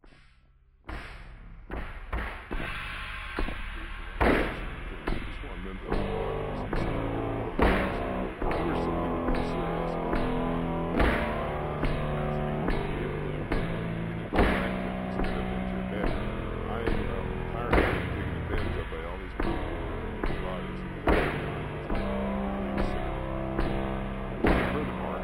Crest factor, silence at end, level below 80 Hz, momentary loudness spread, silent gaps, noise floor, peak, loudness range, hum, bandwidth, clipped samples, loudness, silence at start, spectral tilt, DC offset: 22 dB; 0 s; -36 dBFS; 11 LU; none; -59 dBFS; -8 dBFS; 3 LU; none; 16 kHz; under 0.1%; -31 LUFS; 0.05 s; -7.5 dB/octave; under 0.1%